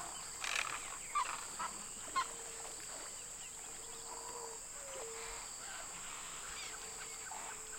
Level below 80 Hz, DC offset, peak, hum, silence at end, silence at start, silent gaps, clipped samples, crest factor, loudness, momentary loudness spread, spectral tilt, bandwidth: -66 dBFS; under 0.1%; -20 dBFS; none; 0 s; 0 s; none; under 0.1%; 26 dB; -43 LUFS; 7 LU; 0.5 dB/octave; 16.5 kHz